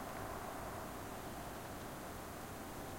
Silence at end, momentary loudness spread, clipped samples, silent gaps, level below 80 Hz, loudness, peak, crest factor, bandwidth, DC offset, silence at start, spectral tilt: 0 s; 2 LU; under 0.1%; none; -60 dBFS; -47 LUFS; -32 dBFS; 16 dB; 16.5 kHz; under 0.1%; 0 s; -4.5 dB/octave